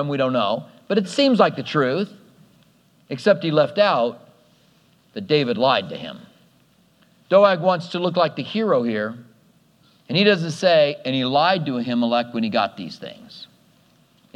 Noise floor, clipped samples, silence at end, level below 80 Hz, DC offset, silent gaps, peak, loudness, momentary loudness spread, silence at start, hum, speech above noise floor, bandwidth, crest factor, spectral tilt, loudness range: -58 dBFS; under 0.1%; 0.9 s; -74 dBFS; under 0.1%; none; 0 dBFS; -20 LUFS; 17 LU; 0 s; none; 38 dB; 10.5 kHz; 20 dB; -6 dB/octave; 3 LU